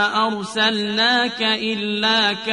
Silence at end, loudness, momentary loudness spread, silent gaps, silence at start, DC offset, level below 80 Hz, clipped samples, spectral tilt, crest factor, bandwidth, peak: 0 s; -18 LUFS; 5 LU; none; 0 s; under 0.1%; -62 dBFS; under 0.1%; -3 dB/octave; 16 dB; 10.5 kHz; -4 dBFS